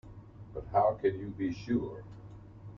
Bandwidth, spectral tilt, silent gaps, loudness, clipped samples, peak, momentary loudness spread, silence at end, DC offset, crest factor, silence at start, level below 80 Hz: 7 kHz; -8.5 dB/octave; none; -32 LUFS; under 0.1%; -16 dBFS; 22 LU; 0 s; under 0.1%; 18 dB; 0.05 s; -56 dBFS